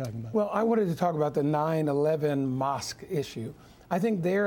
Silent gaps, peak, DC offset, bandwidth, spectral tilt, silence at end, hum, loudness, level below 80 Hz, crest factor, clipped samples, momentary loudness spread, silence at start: none; -12 dBFS; under 0.1%; 17.5 kHz; -7 dB/octave; 0 s; none; -28 LUFS; -62 dBFS; 16 dB; under 0.1%; 7 LU; 0 s